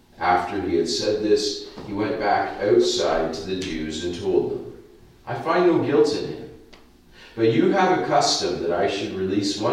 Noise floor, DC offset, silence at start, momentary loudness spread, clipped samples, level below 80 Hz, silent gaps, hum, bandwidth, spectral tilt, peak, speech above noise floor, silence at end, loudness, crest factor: -49 dBFS; under 0.1%; 0.2 s; 14 LU; under 0.1%; -50 dBFS; none; none; 12 kHz; -4.5 dB/octave; -6 dBFS; 28 dB; 0 s; -22 LUFS; 16 dB